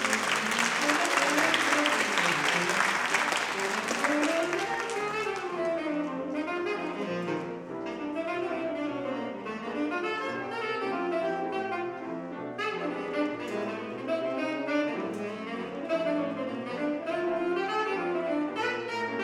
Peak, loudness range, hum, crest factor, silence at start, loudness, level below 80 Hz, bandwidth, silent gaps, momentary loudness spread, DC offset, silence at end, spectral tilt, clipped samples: -8 dBFS; 8 LU; none; 22 dB; 0 s; -29 LUFS; -70 dBFS; 17.5 kHz; none; 10 LU; under 0.1%; 0 s; -3 dB/octave; under 0.1%